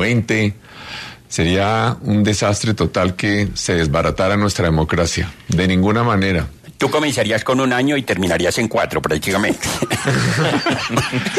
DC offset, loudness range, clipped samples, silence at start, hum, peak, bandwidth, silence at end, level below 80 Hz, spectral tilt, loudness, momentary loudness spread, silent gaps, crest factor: under 0.1%; 1 LU; under 0.1%; 0 s; none; -4 dBFS; 13.5 kHz; 0 s; -36 dBFS; -5 dB/octave; -17 LUFS; 5 LU; none; 14 dB